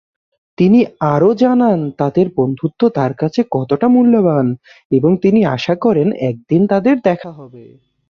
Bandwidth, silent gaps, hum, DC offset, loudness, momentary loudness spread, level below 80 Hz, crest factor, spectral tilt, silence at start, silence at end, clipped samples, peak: 6.8 kHz; 4.85-4.90 s; none; under 0.1%; -14 LUFS; 6 LU; -54 dBFS; 12 dB; -9 dB/octave; 0.6 s; 0.45 s; under 0.1%; -2 dBFS